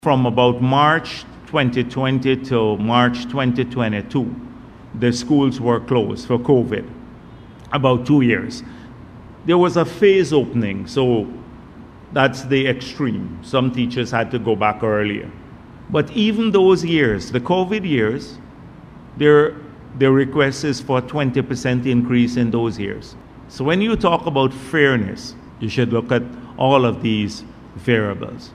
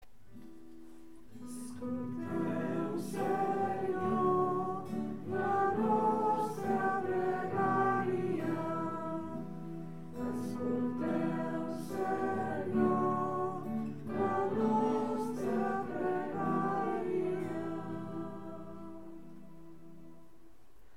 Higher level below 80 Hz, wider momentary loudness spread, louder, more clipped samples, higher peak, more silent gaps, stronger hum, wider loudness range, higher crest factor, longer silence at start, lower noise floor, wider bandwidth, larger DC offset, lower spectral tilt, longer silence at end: first, -46 dBFS vs -66 dBFS; about the same, 15 LU vs 17 LU; first, -18 LUFS vs -34 LUFS; neither; first, 0 dBFS vs -18 dBFS; neither; neither; second, 3 LU vs 6 LU; about the same, 18 dB vs 16 dB; about the same, 0.05 s vs 0 s; second, -40 dBFS vs -63 dBFS; second, 10.5 kHz vs 16 kHz; second, under 0.1% vs 0.4%; about the same, -6.5 dB/octave vs -7.5 dB/octave; second, 0 s vs 0.5 s